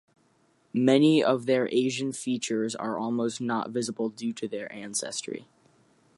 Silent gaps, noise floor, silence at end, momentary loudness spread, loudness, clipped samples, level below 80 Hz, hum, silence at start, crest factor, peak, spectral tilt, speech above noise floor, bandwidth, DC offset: none; -66 dBFS; 0.75 s; 13 LU; -27 LUFS; under 0.1%; -78 dBFS; none; 0.75 s; 20 dB; -8 dBFS; -4.5 dB/octave; 39 dB; 11.5 kHz; under 0.1%